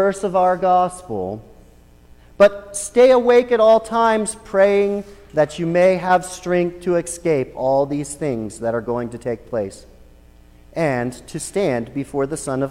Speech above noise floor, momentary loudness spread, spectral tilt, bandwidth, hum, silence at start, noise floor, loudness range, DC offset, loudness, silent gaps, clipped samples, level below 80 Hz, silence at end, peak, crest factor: 29 dB; 13 LU; -5.5 dB/octave; 15 kHz; 60 Hz at -50 dBFS; 0 s; -47 dBFS; 9 LU; under 0.1%; -19 LUFS; none; under 0.1%; -48 dBFS; 0 s; -2 dBFS; 16 dB